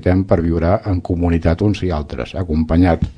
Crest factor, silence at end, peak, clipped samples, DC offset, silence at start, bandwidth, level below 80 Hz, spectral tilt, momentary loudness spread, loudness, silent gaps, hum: 16 dB; 0.05 s; 0 dBFS; under 0.1%; under 0.1%; 0 s; 7 kHz; -28 dBFS; -9 dB/octave; 8 LU; -17 LUFS; none; none